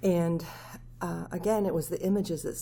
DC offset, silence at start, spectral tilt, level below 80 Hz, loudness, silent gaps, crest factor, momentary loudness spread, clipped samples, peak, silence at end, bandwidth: under 0.1%; 0 s; -6.5 dB/octave; -52 dBFS; -30 LUFS; none; 14 dB; 14 LU; under 0.1%; -16 dBFS; 0 s; 19.5 kHz